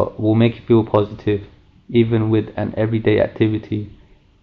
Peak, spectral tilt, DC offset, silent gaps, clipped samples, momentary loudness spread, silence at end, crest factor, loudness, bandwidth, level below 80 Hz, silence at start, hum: -4 dBFS; -10.5 dB/octave; under 0.1%; none; under 0.1%; 9 LU; 0.55 s; 14 dB; -18 LUFS; 4.9 kHz; -46 dBFS; 0 s; none